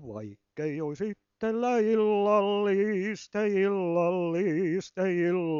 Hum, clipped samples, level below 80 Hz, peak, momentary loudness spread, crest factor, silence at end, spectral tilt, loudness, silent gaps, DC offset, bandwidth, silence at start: none; under 0.1%; -72 dBFS; -12 dBFS; 11 LU; 14 dB; 0 s; -7 dB/octave; -28 LUFS; none; under 0.1%; 7.4 kHz; 0 s